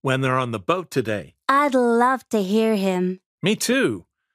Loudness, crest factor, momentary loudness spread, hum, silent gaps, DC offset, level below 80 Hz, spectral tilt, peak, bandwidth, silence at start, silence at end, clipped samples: -21 LUFS; 16 dB; 8 LU; none; 3.26-3.38 s; under 0.1%; -64 dBFS; -5 dB/octave; -4 dBFS; 15.5 kHz; 0.05 s; 0.35 s; under 0.1%